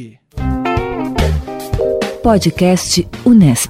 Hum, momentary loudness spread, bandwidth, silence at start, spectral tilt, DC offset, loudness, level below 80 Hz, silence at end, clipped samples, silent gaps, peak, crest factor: none; 11 LU; 16 kHz; 0 s; -5.5 dB/octave; under 0.1%; -14 LUFS; -26 dBFS; 0 s; under 0.1%; none; 0 dBFS; 14 dB